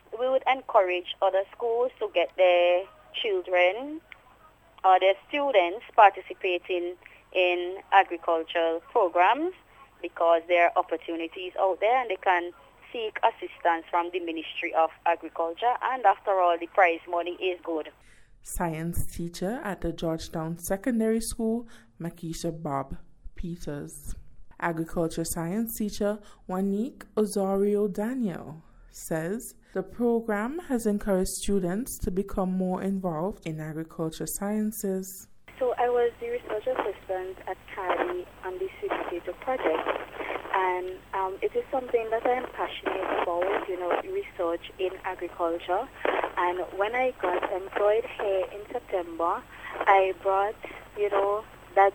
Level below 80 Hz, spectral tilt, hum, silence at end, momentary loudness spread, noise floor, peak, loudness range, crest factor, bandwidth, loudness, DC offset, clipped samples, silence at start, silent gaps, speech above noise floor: -50 dBFS; -5 dB/octave; none; 0 s; 13 LU; -57 dBFS; -4 dBFS; 7 LU; 22 dB; 18.5 kHz; -28 LUFS; under 0.1%; under 0.1%; 0.1 s; none; 29 dB